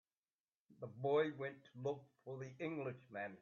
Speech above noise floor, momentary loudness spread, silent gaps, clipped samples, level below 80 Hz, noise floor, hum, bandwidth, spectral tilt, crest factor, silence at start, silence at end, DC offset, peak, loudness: over 47 dB; 15 LU; none; under 0.1%; -88 dBFS; under -90 dBFS; none; 7 kHz; -5.5 dB/octave; 18 dB; 0.7 s; 0.05 s; under 0.1%; -26 dBFS; -44 LUFS